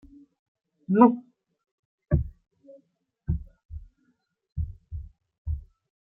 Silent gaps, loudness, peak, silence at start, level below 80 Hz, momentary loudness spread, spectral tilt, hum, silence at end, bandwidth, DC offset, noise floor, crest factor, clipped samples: 1.71-1.98 s, 3.65-3.69 s, 5.38-5.45 s; -26 LUFS; -4 dBFS; 0.9 s; -42 dBFS; 26 LU; -13 dB/octave; none; 0.5 s; 3 kHz; under 0.1%; -72 dBFS; 26 dB; under 0.1%